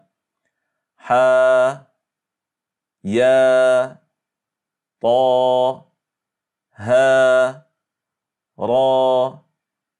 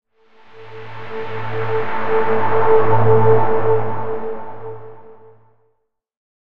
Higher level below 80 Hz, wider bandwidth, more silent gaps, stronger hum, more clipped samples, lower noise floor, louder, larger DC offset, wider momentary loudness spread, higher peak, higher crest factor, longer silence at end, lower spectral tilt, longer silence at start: second, -74 dBFS vs -46 dBFS; first, 10 kHz vs 5.2 kHz; neither; neither; neither; first, -86 dBFS vs -68 dBFS; about the same, -16 LUFS vs -18 LUFS; neither; second, 14 LU vs 20 LU; second, -4 dBFS vs 0 dBFS; about the same, 14 dB vs 16 dB; first, 0.65 s vs 0.25 s; second, -5 dB/octave vs -9 dB/octave; first, 1.05 s vs 0 s